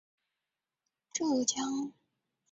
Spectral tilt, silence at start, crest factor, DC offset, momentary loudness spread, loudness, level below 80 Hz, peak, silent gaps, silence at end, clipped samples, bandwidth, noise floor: -2 dB/octave; 1.15 s; 24 dB; under 0.1%; 10 LU; -33 LUFS; -80 dBFS; -12 dBFS; none; 0.6 s; under 0.1%; 8.2 kHz; -90 dBFS